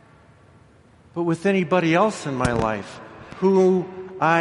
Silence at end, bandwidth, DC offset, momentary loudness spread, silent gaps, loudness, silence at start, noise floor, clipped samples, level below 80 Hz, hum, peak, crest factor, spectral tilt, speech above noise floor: 0 s; 11.5 kHz; under 0.1%; 17 LU; none; -21 LUFS; 1.15 s; -52 dBFS; under 0.1%; -46 dBFS; none; -4 dBFS; 18 dB; -6.5 dB/octave; 32 dB